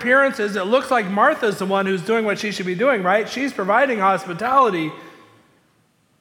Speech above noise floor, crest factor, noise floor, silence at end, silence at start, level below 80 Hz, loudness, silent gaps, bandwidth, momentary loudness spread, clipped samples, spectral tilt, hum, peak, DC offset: 42 dB; 16 dB; -61 dBFS; 1.1 s; 0 s; -68 dBFS; -19 LUFS; none; 17 kHz; 7 LU; under 0.1%; -5 dB/octave; none; -4 dBFS; under 0.1%